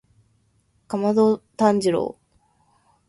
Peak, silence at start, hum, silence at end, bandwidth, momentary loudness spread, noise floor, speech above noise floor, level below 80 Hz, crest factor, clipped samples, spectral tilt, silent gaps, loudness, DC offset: -4 dBFS; 0.9 s; none; 0.95 s; 11.5 kHz; 10 LU; -64 dBFS; 45 dB; -64 dBFS; 18 dB; under 0.1%; -6.5 dB/octave; none; -21 LUFS; under 0.1%